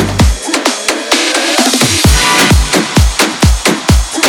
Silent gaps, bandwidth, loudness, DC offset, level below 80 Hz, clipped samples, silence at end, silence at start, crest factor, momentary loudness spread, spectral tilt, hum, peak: none; over 20 kHz; -9 LUFS; under 0.1%; -16 dBFS; 0.2%; 0 s; 0 s; 10 dB; 5 LU; -3.5 dB/octave; none; 0 dBFS